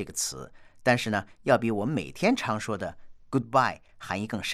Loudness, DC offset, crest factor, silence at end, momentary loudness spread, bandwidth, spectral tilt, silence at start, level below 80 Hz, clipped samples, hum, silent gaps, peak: -28 LUFS; under 0.1%; 20 dB; 0 s; 10 LU; 15.5 kHz; -4.5 dB/octave; 0 s; -58 dBFS; under 0.1%; none; none; -8 dBFS